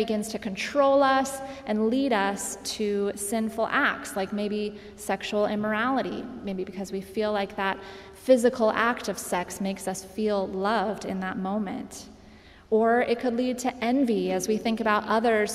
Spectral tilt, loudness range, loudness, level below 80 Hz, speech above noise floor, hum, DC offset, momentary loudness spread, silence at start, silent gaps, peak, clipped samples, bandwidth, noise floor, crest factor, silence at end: -4.5 dB/octave; 4 LU; -26 LUFS; -58 dBFS; 24 dB; none; under 0.1%; 11 LU; 0 s; none; -8 dBFS; under 0.1%; 15.5 kHz; -51 dBFS; 18 dB; 0 s